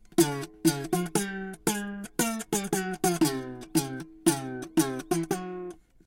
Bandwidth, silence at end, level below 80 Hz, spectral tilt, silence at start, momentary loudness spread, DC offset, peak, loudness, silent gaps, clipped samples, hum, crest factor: 17 kHz; 0.3 s; -58 dBFS; -4 dB/octave; 0.1 s; 9 LU; under 0.1%; -8 dBFS; -29 LUFS; none; under 0.1%; none; 22 dB